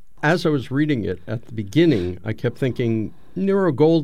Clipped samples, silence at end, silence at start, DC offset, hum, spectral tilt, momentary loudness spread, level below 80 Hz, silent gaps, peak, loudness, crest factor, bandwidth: under 0.1%; 0 s; 0.25 s; 1%; none; -7.5 dB/octave; 11 LU; -52 dBFS; none; -6 dBFS; -21 LUFS; 14 dB; 14 kHz